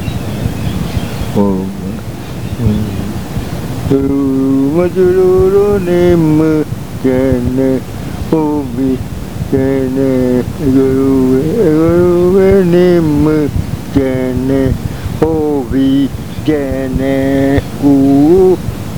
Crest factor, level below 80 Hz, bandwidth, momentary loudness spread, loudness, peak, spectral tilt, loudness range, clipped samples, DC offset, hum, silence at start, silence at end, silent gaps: 12 dB; -28 dBFS; over 20 kHz; 11 LU; -12 LUFS; 0 dBFS; -8 dB/octave; 6 LU; under 0.1%; 3%; none; 0 s; 0 s; none